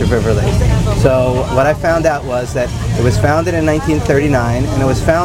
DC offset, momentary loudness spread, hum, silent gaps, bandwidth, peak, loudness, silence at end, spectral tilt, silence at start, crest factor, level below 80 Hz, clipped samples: 0.3%; 5 LU; none; none; 16 kHz; 0 dBFS; -14 LUFS; 0 s; -6.5 dB/octave; 0 s; 12 dB; -22 dBFS; under 0.1%